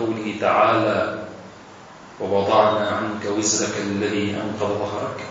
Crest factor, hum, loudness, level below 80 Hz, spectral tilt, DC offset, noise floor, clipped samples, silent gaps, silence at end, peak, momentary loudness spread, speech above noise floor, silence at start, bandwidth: 20 dB; none; -21 LUFS; -62 dBFS; -4 dB/octave; under 0.1%; -42 dBFS; under 0.1%; none; 0 s; -2 dBFS; 13 LU; 21 dB; 0 s; 8.2 kHz